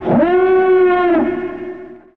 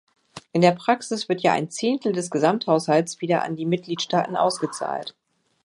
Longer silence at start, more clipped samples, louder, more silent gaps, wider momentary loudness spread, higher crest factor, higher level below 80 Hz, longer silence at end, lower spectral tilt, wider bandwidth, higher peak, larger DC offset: second, 0 s vs 0.35 s; neither; first, -13 LUFS vs -23 LUFS; neither; first, 17 LU vs 8 LU; second, 12 dB vs 22 dB; first, -46 dBFS vs -70 dBFS; second, 0.2 s vs 0.55 s; first, -9.5 dB/octave vs -5 dB/octave; second, 4.3 kHz vs 11.5 kHz; about the same, -2 dBFS vs -2 dBFS; first, 0.5% vs under 0.1%